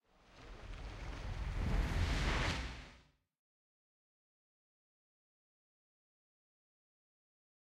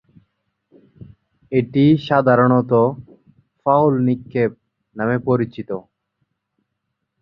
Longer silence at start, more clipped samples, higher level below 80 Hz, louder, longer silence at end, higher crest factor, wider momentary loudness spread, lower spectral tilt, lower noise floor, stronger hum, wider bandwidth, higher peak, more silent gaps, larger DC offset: second, 0.35 s vs 1.5 s; neither; first, -46 dBFS vs -56 dBFS; second, -40 LUFS vs -18 LUFS; first, 4.8 s vs 1.4 s; about the same, 20 dB vs 18 dB; first, 19 LU vs 11 LU; second, -5 dB/octave vs -10 dB/octave; second, -66 dBFS vs -76 dBFS; neither; first, 12.5 kHz vs 5.4 kHz; second, -24 dBFS vs -2 dBFS; neither; neither